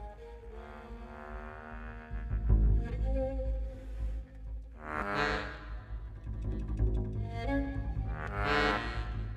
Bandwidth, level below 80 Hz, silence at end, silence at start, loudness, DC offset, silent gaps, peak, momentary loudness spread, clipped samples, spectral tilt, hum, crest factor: 8.2 kHz; -36 dBFS; 0 s; 0 s; -35 LUFS; under 0.1%; none; -14 dBFS; 17 LU; under 0.1%; -7 dB/octave; none; 20 dB